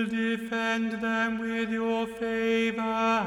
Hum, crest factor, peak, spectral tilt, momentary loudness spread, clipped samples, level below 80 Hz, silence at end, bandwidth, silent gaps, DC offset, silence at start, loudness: none; 12 dB; -14 dBFS; -5 dB/octave; 4 LU; under 0.1%; -62 dBFS; 0 s; 12 kHz; none; under 0.1%; 0 s; -28 LUFS